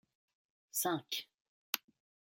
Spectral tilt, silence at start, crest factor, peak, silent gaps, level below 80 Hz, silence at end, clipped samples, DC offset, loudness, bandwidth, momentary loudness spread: -2 dB/octave; 0.75 s; 34 dB; -10 dBFS; 1.41-1.73 s; -90 dBFS; 0.6 s; under 0.1%; under 0.1%; -39 LUFS; 17 kHz; 6 LU